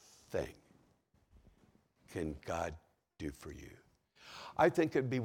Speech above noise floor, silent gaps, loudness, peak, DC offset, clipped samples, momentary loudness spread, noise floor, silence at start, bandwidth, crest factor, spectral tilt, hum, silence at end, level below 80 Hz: 36 dB; none; -37 LUFS; -14 dBFS; under 0.1%; under 0.1%; 22 LU; -72 dBFS; 0.3 s; 17 kHz; 24 dB; -6.5 dB/octave; none; 0 s; -62 dBFS